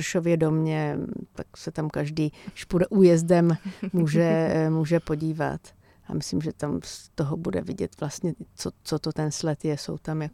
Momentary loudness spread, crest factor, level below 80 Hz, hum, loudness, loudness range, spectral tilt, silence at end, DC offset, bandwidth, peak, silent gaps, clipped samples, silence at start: 13 LU; 18 dB; -52 dBFS; none; -26 LUFS; 8 LU; -6.5 dB/octave; 0.05 s; under 0.1%; 13.5 kHz; -6 dBFS; none; under 0.1%; 0 s